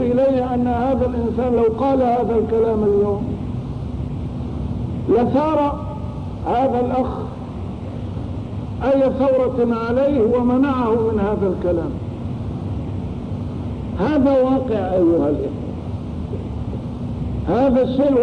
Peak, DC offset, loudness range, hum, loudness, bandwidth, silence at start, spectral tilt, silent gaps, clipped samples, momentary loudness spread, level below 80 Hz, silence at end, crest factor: -8 dBFS; 0.3%; 4 LU; none; -20 LUFS; 9.4 kHz; 0 s; -9.5 dB/octave; none; under 0.1%; 11 LU; -34 dBFS; 0 s; 12 dB